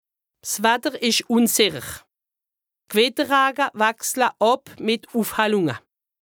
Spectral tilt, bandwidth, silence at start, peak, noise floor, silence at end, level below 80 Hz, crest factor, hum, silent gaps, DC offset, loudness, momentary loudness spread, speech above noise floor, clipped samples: -2.5 dB/octave; over 20 kHz; 0.45 s; -4 dBFS; -87 dBFS; 0.45 s; -62 dBFS; 20 dB; none; none; under 0.1%; -20 LUFS; 10 LU; 67 dB; under 0.1%